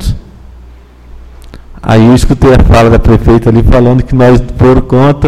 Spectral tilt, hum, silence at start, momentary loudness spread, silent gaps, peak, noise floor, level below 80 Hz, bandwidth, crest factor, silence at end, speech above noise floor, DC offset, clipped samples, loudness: -8 dB/octave; 60 Hz at -25 dBFS; 0 s; 4 LU; none; 0 dBFS; -32 dBFS; -14 dBFS; 13 kHz; 6 dB; 0 s; 28 dB; under 0.1%; 4%; -6 LUFS